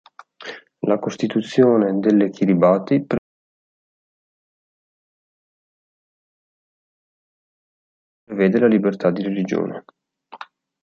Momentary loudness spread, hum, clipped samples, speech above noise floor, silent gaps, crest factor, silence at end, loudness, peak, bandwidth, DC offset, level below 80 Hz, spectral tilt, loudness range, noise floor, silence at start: 20 LU; none; under 0.1%; 24 dB; 3.18-8.27 s; 20 dB; 0.4 s; -19 LUFS; -2 dBFS; 7.6 kHz; under 0.1%; -64 dBFS; -8 dB/octave; 9 LU; -41 dBFS; 0.4 s